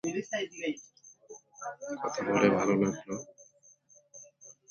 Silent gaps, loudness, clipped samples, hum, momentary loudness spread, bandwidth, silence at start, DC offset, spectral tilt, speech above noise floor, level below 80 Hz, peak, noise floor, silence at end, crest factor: none; -31 LUFS; under 0.1%; none; 26 LU; 7.2 kHz; 0.05 s; under 0.1%; -5 dB/octave; 31 dB; -70 dBFS; -10 dBFS; -62 dBFS; 0.2 s; 22 dB